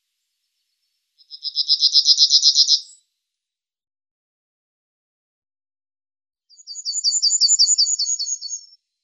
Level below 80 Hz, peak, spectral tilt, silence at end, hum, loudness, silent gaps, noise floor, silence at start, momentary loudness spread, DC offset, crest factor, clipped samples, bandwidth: under -90 dBFS; -2 dBFS; 14 dB/octave; 0.45 s; none; -14 LUFS; 4.11-5.42 s; -87 dBFS; 1.3 s; 17 LU; under 0.1%; 20 dB; under 0.1%; 11.5 kHz